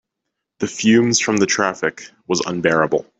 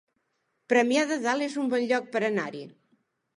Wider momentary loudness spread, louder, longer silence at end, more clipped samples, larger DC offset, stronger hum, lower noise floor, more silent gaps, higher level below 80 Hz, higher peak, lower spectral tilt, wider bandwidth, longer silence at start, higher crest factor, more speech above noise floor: first, 11 LU vs 8 LU; first, -18 LUFS vs -26 LUFS; second, 0.15 s vs 0.65 s; neither; neither; neither; about the same, -79 dBFS vs -76 dBFS; neither; first, -60 dBFS vs -82 dBFS; first, -2 dBFS vs -10 dBFS; about the same, -3.5 dB/octave vs -4 dB/octave; second, 8.4 kHz vs 11.5 kHz; about the same, 0.6 s vs 0.7 s; about the same, 16 dB vs 18 dB; first, 61 dB vs 50 dB